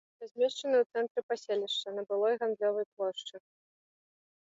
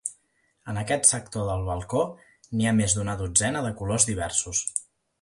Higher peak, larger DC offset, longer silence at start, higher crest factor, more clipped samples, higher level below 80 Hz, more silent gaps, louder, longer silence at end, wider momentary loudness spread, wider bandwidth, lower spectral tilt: second, -18 dBFS vs -4 dBFS; neither; first, 0.2 s vs 0.05 s; second, 16 dB vs 24 dB; neither; second, -90 dBFS vs -46 dBFS; first, 0.31-0.35 s, 0.86-0.90 s, 1.11-1.15 s, 1.23-1.29 s, 2.86-2.97 s vs none; second, -32 LUFS vs -25 LUFS; first, 1.15 s vs 0.4 s; second, 7 LU vs 13 LU; second, 7.8 kHz vs 11.5 kHz; about the same, -3 dB/octave vs -3.5 dB/octave